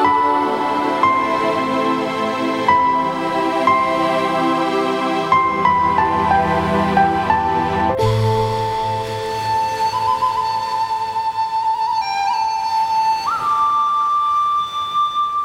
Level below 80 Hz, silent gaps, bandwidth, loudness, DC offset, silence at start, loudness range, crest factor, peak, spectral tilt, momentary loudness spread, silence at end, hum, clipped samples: -44 dBFS; none; 16.5 kHz; -17 LUFS; under 0.1%; 0 s; 3 LU; 16 dB; -2 dBFS; -5.5 dB/octave; 5 LU; 0 s; none; under 0.1%